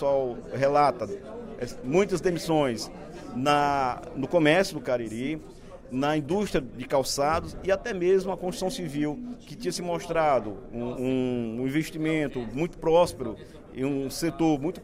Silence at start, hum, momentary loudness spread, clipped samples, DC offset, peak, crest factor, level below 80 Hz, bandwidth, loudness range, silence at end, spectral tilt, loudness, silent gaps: 0 s; none; 14 LU; under 0.1%; under 0.1%; -8 dBFS; 18 dB; -48 dBFS; 16 kHz; 3 LU; 0 s; -5.5 dB/octave; -27 LUFS; none